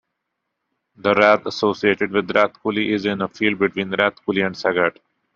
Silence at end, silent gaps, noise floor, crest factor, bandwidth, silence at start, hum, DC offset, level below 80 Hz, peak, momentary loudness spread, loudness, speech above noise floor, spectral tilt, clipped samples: 0.45 s; none; -78 dBFS; 20 dB; 7.4 kHz; 1.05 s; none; under 0.1%; -62 dBFS; 0 dBFS; 6 LU; -19 LUFS; 58 dB; -3 dB/octave; under 0.1%